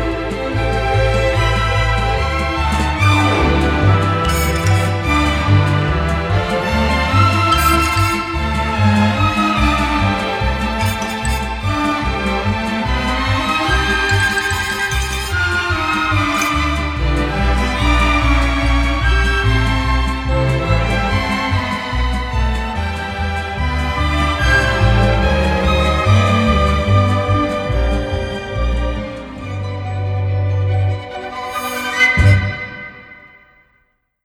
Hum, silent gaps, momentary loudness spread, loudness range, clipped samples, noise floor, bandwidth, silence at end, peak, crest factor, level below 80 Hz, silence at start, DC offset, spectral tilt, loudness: none; none; 8 LU; 4 LU; under 0.1%; -61 dBFS; 16 kHz; 0.95 s; 0 dBFS; 14 dB; -22 dBFS; 0 s; under 0.1%; -5.5 dB/octave; -16 LUFS